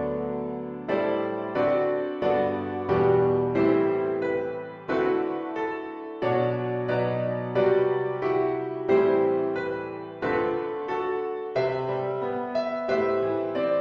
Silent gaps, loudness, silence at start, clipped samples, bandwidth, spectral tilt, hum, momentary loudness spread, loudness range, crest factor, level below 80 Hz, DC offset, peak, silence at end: none; -26 LUFS; 0 s; under 0.1%; 5.8 kHz; -8.5 dB/octave; none; 8 LU; 3 LU; 16 dB; -58 dBFS; under 0.1%; -10 dBFS; 0 s